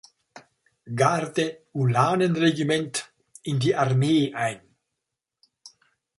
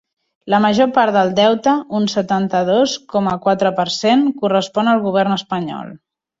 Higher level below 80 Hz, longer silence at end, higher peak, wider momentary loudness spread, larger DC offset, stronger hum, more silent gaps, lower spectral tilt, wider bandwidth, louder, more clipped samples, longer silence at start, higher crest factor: second, -64 dBFS vs -58 dBFS; about the same, 0.5 s vs 0.45 s; about the same, -4 dBFS vs -2 dBFS; first, 12 LU vs 6 LU; neither; neither; neither; about the same, -5.5 dB/octave vs -5.5 dB/octave; first, 11.5 kHz vs 7.8 kHz; second, -24 LUFS vs -16 LUFS; neither; about the same, 0.35 s vs 0.45 s; first, 20 dB vs 14 dB